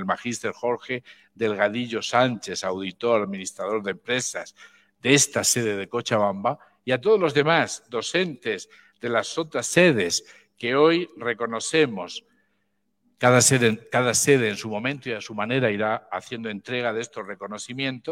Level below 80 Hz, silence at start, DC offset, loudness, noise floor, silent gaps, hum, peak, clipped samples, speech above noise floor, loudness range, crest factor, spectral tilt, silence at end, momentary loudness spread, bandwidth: -68 dBFS; 0 s; under 0.1%; -23 LUFS; -74 dBFS; none; none; -2 dBFS; under 0.1%; 50 dB; 4 LU; 22 dB; -3.5 dB/octave; 0 s; 14 LU; 16.5 kHz